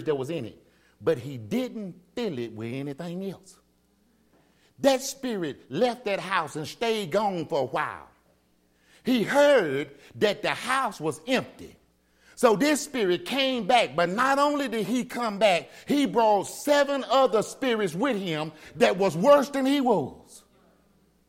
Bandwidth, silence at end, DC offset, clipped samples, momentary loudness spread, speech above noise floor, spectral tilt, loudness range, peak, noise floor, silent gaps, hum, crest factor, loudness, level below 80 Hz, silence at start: 16.5 kHz; 0.9 s; under 0.1%; under 0.1%; 13 LU; 40 dB; -4.5 dB/octave; 8 LU; -6 dBFS; -66 dBFS; none; none; 20 dB; -25 LUFS; -66 dBFS; 0 s